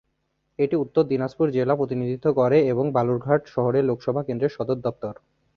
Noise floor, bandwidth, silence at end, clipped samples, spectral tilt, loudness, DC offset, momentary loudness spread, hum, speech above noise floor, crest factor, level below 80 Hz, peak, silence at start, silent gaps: -73 dBFS; 6.6 kHz; 0.45 s; under 0.1%; -9.5 dB/octave; -23 LUFS; under 0.1%; 8 LU; none; 51 dB; 18 dB; -60 dBFS; -4 dBFS; 0.6 s; none